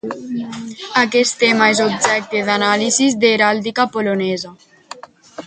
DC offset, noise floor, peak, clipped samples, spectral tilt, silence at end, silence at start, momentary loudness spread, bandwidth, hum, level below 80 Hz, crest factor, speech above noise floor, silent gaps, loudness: under 0.1%; -38 dBFS; 0 dBFS; under 0.1%; -3 dB/octave; 0 s; 0.05 s; 16 LU; 9.6 kHz; none; -62 dBFS; 16 dB; 21 dB; none; -15 LUFS